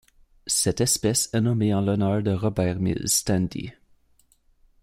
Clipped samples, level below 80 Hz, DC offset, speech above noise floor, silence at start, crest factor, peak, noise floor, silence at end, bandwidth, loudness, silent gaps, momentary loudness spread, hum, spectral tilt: under 0.1%; -50 dBFS; under 0.1%; 39 dB; 0.45 s; 16 dB; -8 dBFS; -62 dBFS; 1.1 s; 16 kHz; -23 LUFS; none; 7 LU; none; -4.5 dB/octave